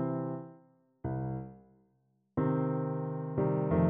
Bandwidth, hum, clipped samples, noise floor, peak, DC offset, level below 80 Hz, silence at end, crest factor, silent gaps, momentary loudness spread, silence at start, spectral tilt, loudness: 3.4 kHz; none; under 0.1%; -74 dBFS; -16 dBFS; under 0.1%; -56 dBFS; 0 s; 18 dB; none; 12 LU; 0 s; -11 dB/octave; -34 LUFS